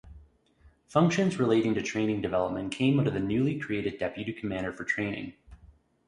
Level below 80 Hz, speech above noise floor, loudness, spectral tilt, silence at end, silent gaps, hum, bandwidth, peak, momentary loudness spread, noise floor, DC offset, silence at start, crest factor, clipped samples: -56 dBFS; 33 dB; -29 LUFS; -6.5 dB/octave; 0.4 s; none; none; 11 kHz; -10 dBFS; 9 LU; -61 dBFS; under 0.1%; 0.05 s; 20 dB; under 0.1%